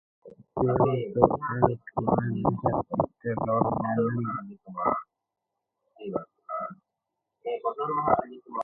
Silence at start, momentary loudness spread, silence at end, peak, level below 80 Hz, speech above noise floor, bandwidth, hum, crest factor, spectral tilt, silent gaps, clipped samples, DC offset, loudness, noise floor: 0.25 s; 13 LU; 0 s; -2 dBFS; -54 dBFS; 58 dB; 3.1 kHz; none; 26 dB; -11.5 dB/octave; none; under 0.1%; under 0.1%; -28 LUFS; -85 dBFS